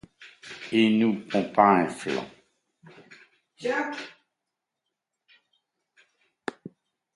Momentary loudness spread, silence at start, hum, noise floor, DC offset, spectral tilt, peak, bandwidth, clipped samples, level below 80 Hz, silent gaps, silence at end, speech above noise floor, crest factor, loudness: 22 LU; 0.2 s; none; -85 dBFS; under 0.1%; -6 dB/octave; -4 dBFS; 11.5 kHz; under 0.1%; -70 dBFS; none; 0.45 s; 61 dB; 24 dB; -24 LUFS